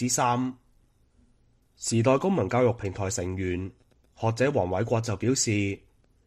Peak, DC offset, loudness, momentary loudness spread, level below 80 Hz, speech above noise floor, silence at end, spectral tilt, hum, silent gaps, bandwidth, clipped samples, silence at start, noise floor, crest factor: -10 dBFS; under 0.1%; -27 LUFS; 10 LU; -56 dBFS; 38 dB; 0.5 s; -5 dB/octave; none; none; 15 kHz; under 0.1%; 0 s; -63 dBFS; 18 dB